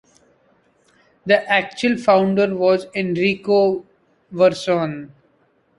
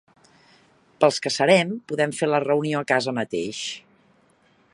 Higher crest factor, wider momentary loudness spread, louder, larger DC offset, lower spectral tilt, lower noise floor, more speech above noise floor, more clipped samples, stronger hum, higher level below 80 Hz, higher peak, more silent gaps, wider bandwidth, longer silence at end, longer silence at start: about the same, 18 dB vs 22 dB; about the same, 12 LU vs 11 LU; first, -18 LUFS vs -22 LUFS; neither; first, -6 dB/octave vs -4.5 dB/octave; about the same, -61 dBFS vs -60 dBFS; first, 43 dB vs 38 dB; neither; neither; first, -62 dBFS vs -70 dBFS; about the same, -2 dBFS vs -2 dBFS; neither; about the same, 11.5 kHz vs 11.5 kHz; second, 0.7 s vs 0.95 s; first, 1.25 s vs 1 s